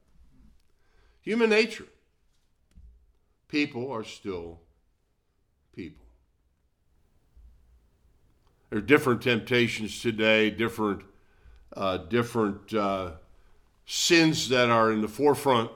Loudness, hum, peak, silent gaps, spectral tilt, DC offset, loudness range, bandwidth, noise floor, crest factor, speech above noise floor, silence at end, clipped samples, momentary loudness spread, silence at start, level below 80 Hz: -25 LUFS; none; -6 dBFS; none; -4.5 dB/octave; under 0.1%; 11 LU; 17.5 kHz; -71 dBFS; 22 dB; 46 dB; 0 s; under 0.1%; 17 LU; 1.25 s; -58 dBFS